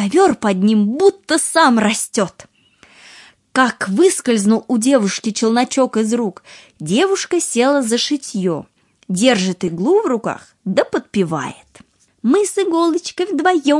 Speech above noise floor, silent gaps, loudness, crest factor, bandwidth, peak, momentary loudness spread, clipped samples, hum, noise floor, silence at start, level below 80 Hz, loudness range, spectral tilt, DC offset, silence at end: 34 dB; none; -16 LUFS; 16 dB; 11.5 kHz; 0 dBFS; 8 LU; under 0.1%; none; -49 dBFS; 0 s; -62 dBFS; 3 LU; -4 dB/octave; under 0.1%; 0 s